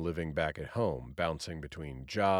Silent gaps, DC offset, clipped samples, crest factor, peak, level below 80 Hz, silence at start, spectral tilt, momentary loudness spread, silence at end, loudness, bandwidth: none; under 0.1%; under 0.1%; 18 dB; -16 dBFS; -52 dBFS; 0 s; -6 dB/octave; 9 LU; 0 s; -36 LUFS; 14.5 kHz